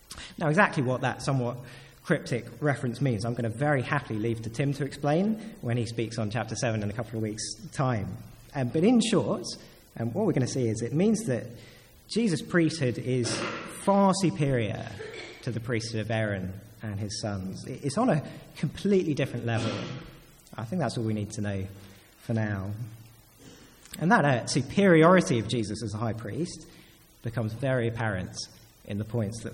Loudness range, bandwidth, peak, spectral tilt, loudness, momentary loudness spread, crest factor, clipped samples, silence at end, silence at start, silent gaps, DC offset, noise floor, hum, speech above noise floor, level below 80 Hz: 8 LU; 16.5 kHz; -8 dBFS; -6 dB/octave; -28 LUFS; 16 LU; 22 dB; under 0.1%; 0 s; 0.1 s; none; under 0.1%; -52 dBFS; none; 24 dB; -58 dBFS